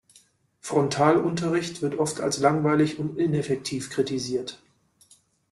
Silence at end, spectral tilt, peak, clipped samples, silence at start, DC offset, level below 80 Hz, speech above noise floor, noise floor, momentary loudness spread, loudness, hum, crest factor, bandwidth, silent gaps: 0.95 s; -5.5 dB/octave; -4 dBFS; under 0.1%; 0.65 s; under 0.1%; -62 dBFS; 36 dB; -60 dBFS; 9 LU; -25 LUFS; none; 20 dB; 12.5 kHz; none